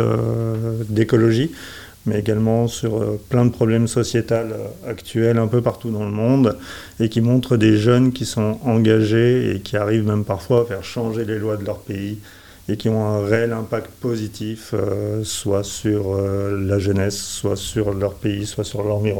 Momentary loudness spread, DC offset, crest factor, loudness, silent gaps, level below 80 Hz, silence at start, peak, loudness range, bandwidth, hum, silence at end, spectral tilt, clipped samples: 11 LU; 0.2%; 18 dB; -20 LUFS; none; -48 dBFS; 0 s; -2 dBFS; 6 LU; 18 kHz; none; 0 s; -6.5 dB/octave; under 0.1%